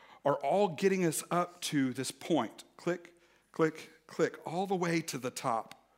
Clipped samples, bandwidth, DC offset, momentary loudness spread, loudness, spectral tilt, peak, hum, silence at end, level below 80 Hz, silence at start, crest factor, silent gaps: under 0.1%; 16 kHz; under 0.1%; 10 LU; -33 LUFS; -5 dB/octave; -16 dBFS; none; 0.3 s; -82 dBFS; 0.1 s; 18 dB; none